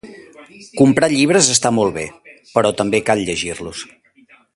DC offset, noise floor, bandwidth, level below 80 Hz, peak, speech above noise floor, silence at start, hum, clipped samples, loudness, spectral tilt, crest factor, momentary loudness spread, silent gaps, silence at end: under 0.1%; -51 dBFS; 11.5 kHz; -50 dBFS; 0 dBFS; 35 dB; 0.05 s; none; under 0.1%; -15 LUFS; -3.5 dB/octave; 18 dB; 18 LU; none; 0.7 s